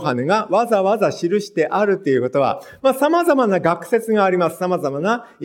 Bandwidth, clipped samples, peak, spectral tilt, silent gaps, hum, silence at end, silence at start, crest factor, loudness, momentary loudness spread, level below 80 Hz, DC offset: 17 kHz; under 0.1%; -2 dBFS; -6 dB/octave; none; none; 0 s; 0 s; 16 dB; -18 LUFS; 5 LU; -66 dBFS; under 0.1%